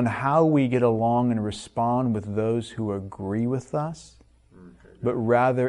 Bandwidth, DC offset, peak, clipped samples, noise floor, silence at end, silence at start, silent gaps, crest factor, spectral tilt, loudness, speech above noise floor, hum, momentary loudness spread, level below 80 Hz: 11 kHz; under 0.1%; -8 dBFS; under 0.1%; -50 dBFS; 0 s; 0 s; none; 16 dB; -8 dB/octave; -24 LUFS; 27 dB; none; 10 LU; -56 dBFS